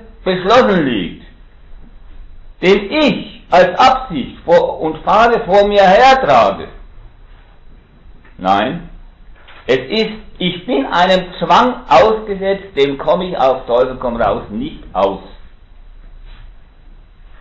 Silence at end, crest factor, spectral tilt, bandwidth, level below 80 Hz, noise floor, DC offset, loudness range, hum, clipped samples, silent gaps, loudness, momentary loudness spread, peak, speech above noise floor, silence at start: 0.05 s; 14 dB; -5.5 dB/octave; 7.6 kHz; -38 dBFS; -40 dBFS; under 0.1%; 9 LU; none; under 0.1%; none; -13 LUFS; 13 LU; 0 dBFS; 27 dB; 0.2 s